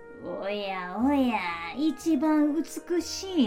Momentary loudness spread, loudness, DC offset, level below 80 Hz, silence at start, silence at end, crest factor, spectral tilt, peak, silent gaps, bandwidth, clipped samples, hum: 8 LU; -28 LUFS; under 0.1%; -58 dBFS; 0 s; 0 s; 16 dB; -4 dB/octave; -12 dBFS; none; 16 kHz; under 0.1%; none